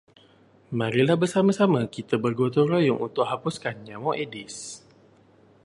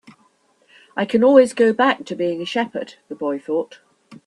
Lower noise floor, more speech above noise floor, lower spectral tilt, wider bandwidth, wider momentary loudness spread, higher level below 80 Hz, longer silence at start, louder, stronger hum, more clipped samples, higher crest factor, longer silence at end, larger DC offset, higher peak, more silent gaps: about the same, -57 dBFS vs -60 dBFS; second, 33 dB vs 41 dB; about the same, -6 dB/octave vs -5 dB/octave; about the same, 11.5 kHz vs 11.5 kHz; second, 14 LU vs 18 LU; about the same, -66 dBFS vs -68 dBFS; second, 0.7 s vs 0.95 s; second, -24 LUFS vs -18 LUFS; neither; neither; about the same, 20 dB vs 20 dB; first, 0.85 s vs 0.1 s; neither; second, -6 dBFS vs 0 dBFS; neither